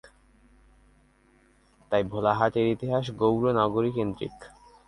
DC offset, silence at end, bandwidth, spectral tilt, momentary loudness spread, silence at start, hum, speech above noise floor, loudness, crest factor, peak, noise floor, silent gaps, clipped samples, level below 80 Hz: under 0.1%; 0.4 s; 11.5 kHz; -8 dB/octave; 7 LU; 1.9 s; none; 36 dB; -26 LUFS; 22 dB; -8 dBFS; -62 dBFS; none; under 0.1%; -56 dBFS